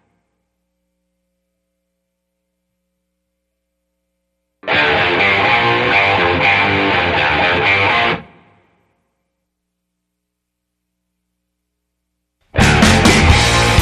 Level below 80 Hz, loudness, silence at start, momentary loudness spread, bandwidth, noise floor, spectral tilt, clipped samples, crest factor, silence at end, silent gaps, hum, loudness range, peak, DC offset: -30 dBFS; -12 LUFS; 4.65 s; 5 LU; 14 kHz; -76 dBFS; -4 dB/octave; under 0.1%; 16 dB; 0 s; none; 60 Hz at -55 dBFS; 10 LU; 0 dBFS; under 0.1%